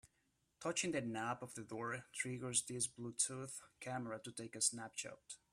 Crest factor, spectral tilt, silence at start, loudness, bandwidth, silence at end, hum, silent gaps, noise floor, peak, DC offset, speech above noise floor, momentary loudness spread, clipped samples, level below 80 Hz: 24 dB; -2.5 dB/octave; 0.05 s; -42 LUFS; 14.5 kHz; 0.15 s; none; none; -82 dBFS; -20 dBFS; under 0.1%; 38 dB; 11 LU; under 0.1%; -80 dBFS